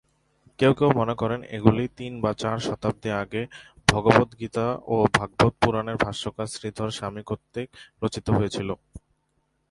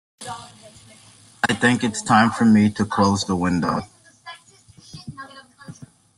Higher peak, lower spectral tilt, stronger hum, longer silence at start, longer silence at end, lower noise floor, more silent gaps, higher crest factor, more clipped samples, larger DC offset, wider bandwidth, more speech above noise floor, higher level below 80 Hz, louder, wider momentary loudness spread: about the same, 0 dBFS vs -2 dBFS; about the same, -6 dB/octave vs -5 dB/octave; neither; first, 0.6 s vs 0.2 s; first, 0.7 s vs 0.3 s; first, -72 dBFS vs -50 dBFS; neither; about the same, 24 dB vs 20 dB; neither; neither; about the same, 11.5 kHz vs 11.5 kHz; first, 47 dB vs 32 dB; first, -48 dBFS vs -56 dBFS; second, -25 LUFS vs -19 LUFS; second, 12 LU vs 25 LU